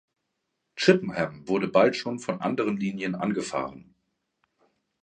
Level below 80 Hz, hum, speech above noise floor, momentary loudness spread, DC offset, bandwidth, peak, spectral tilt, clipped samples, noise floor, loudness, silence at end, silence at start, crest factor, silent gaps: -66 dBFS; none; 54 dB; 10 LU; under 0.1%; 9.6 kHz; -4 dBFS; -5.5 dB/octave; under 0.1%; -80 dBFS; -26 LUFS; 1.2 s; 0.75 s; 24 dB; none